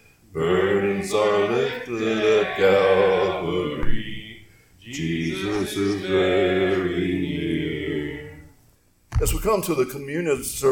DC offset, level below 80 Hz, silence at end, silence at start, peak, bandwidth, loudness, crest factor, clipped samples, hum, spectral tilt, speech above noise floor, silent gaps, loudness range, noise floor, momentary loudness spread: under 0.1%; -38 dBFS; 0 s; 0.35 s; -6 dBFS; 18 kHz; -22 LUFS; 16 dB; under 0.1%; none; -5 dB/octave; 37 dB; none; 5 LU; -58 dBFS; 12 LU